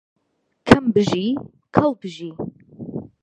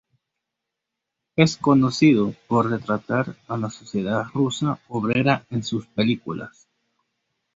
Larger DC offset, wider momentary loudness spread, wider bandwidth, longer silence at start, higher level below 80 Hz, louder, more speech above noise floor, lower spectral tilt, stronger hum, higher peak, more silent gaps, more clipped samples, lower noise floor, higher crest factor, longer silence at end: neither; first, 18 LU vs 12 LU; first, 11 kHz vs 8 kHz; second, 0.65 s vs 1.35 s; first, -44 dBFS vs -58 dBFS; first, -19 LUFS vs -22 LUFS; second, 49 dB vs 62 dB; about the same, -6.5 dB/octave vs -6 dB/octave; neither; about the same, 0 dBFS vs -2 dBFS; neither; neither; second, -70 dBFS vs -83 dBFS; about the same, 22 dB vs 22 dB; second, 0.15 s vs 1.05 s